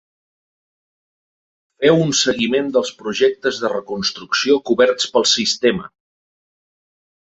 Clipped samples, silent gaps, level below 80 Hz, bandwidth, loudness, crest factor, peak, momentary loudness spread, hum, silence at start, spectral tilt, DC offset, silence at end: under 0.1%; none; -58 dBFS; 8.2 kHz; -17 LUFS; 18 dB; 0 dBFS; 8 LU; none; 1.8 s; -3.5 dB/octave; under 0.1%; 1.45 s